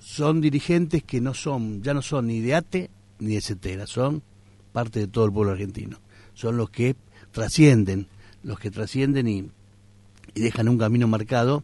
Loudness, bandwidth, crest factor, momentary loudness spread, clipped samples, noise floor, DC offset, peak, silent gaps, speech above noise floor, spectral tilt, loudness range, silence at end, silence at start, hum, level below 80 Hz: -24 LUFS; 11.5 kHz; 18 dB; 13 LU; under 0.1%; -52 dBFS; under 0.1%; -4 dBFS; none; 30 dB; -6.5 dB/octave; 4 LU; 0 s; 0.05 s; none; -48 dBFS